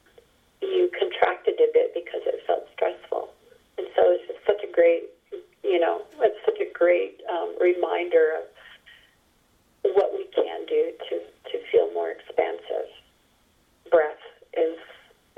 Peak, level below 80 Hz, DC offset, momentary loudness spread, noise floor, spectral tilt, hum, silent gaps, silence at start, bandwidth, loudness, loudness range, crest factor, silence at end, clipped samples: -4 dBFS; -70 dBFS; under 0.1%; 13 LU; -63 dBFS; -5 dB/octave; none; none; 0.6 s; 4 kHz; -25 LUFS; 4 LU; 20 dB; 0.45 s; under 0.1%